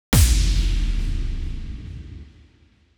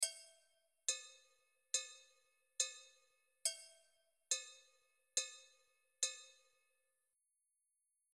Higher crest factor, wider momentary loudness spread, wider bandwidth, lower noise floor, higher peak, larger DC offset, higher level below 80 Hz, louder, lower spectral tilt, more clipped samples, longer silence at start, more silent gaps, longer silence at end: second, 16 dB vs 28 dB; about the same, 21 LU vs 20 LU; first, over 20 kHz vs 13.5 kHz; second, -56 dBFS vs -86 dBFS; first, -4 dBFS vs -22 dBFS; neither; first, -22 dBFS vs under -90 dBFS; first, -23 LUFS vs -42 LUFS; first, -4 dB/octave vs 5.5 dB/octave; neither; about the same, 0.1 s vs 0 s; neither; second, 0.75 s vs 1.8 s